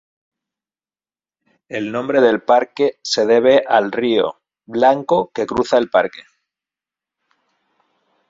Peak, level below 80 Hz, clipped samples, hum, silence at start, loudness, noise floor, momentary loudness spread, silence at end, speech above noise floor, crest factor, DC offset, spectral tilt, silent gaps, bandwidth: -2 dBFS; -58 dBFS; under 0.1%; none; 1.7 s; -16 LUFS; under -90 dBFS; 11 LU; 2.1 s; over 74 dB; 18 dB; under 0.1%; -4.5 dB/octave; none; 7.8 kHz